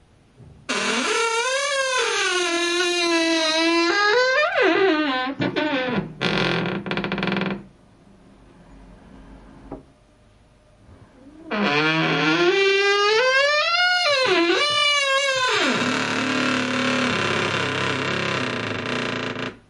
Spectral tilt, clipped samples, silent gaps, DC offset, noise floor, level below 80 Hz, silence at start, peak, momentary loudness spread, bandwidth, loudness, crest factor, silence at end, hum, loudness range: -3 dB/octave; under 0.1%; none; under 0.1%; -54 dBFS; -56 dBFS; 0.4 s; -6 dBFS; 8 LU; 11.5 kHz; -20 LUFS; 16 dB; 0.15 s; none; 10 LU